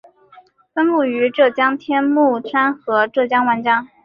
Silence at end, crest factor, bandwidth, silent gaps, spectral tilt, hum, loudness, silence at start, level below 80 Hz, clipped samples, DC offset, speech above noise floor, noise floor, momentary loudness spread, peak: 0.2 s; 14 dB; 5.2 kHz; none; -7 dB/octave; none; -17 LUFS; 0.75 s; -66 dBFS; under 0.1%; under 0.1%; 32 dB; -48 dBFS; 4 LU; -2 dBFS